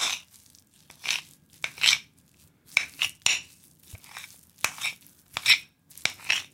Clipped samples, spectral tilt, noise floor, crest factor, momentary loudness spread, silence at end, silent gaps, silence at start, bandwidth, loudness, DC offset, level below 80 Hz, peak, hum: under 0.1%; 2 dB/octave; -60 dBFS; 28 dB; 21 LU; 0.1 s; none; 0 s; 17 kHz; -26 LUFS; under 0.1%; -66 dBFS; -2 dBFS; none